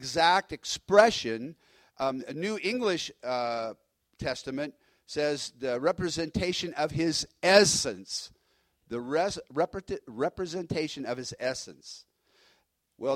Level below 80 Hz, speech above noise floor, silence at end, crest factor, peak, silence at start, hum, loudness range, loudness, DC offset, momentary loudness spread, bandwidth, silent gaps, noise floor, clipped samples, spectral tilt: -58 dBFS; 43 dB; 0 s; 24 dB; -6 dBFS; 0 s; none; 6 LU; -29 LUFS; under 0.1%; 17 LU; 16 kHz; none; -72 dBFS; under 0.1%; -3.5 dB/octave